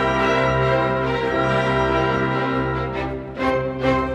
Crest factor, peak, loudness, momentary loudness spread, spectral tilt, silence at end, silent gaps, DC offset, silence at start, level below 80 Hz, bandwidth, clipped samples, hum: 14 dB; -6 dBFS; -20 LUFS; 6 LU; -6.5 dB/octave; 0 s; none; under 0.1%; 0 s; -36 dBFS; 9.8 kHz; under 0.1%; none